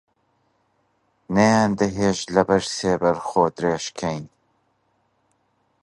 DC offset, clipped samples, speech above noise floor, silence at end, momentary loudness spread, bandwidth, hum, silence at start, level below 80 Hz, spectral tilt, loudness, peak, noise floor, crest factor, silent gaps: under 0.1%; under 0.1%; 47 dB; 1.55 s; 10 LU; 11.5 kHz; none; 1.3 s; -52 dBFS; -5 dB/octave; -21 LUFS; -2 dBFS; -68 dBFS; 22 dB; none